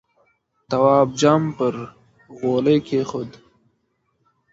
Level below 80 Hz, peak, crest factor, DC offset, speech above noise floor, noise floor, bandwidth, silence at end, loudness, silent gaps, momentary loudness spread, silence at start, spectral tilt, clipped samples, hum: -58 dBFS; -2 dBFS; 20 dB; under 0.1%; 51 dB; -69 dBFS; 8 kHz; 1.2 s; -19 LUFS; none; 16 LU; 0.7 s; -6.5 dB/octave; under 0.1%; none